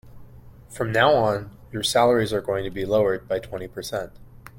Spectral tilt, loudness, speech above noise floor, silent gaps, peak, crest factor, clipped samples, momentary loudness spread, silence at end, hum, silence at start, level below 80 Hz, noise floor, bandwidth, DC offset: -4.5 dB/octave; -23 LUFS; 22 dB; none; -4 dBFS; 20 dB; under 0.1%; 15 LU; 0 s; none; 0.05 s; -48 dBFS; -44 dBFS; 16.5 kHz; under 0.1%